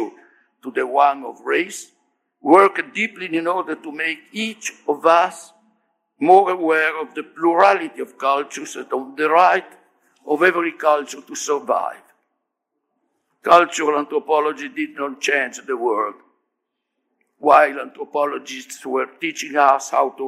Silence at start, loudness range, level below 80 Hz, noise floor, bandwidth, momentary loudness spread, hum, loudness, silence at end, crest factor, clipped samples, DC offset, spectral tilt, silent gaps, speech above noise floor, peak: 0 s; 4 LU; -72 dBFS; -78 dBFS; 15 kHz; 15 LU; none; -19 LUFS; 0 s; 20 dB; under 0.1%; under 0.1%; -3 dB/octave; none; 59 dB; 0 dBFS